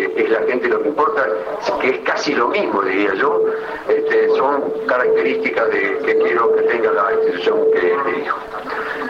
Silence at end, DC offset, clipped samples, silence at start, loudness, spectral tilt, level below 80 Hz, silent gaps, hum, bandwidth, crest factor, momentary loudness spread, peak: 0 s; under 0.1%; under 0.1%; 0 s; -17 LUFS; -4.5 dB/octave; -58 dBFS; none; none; 7 kHz; 12 dB; 6 LU; -6 dBFS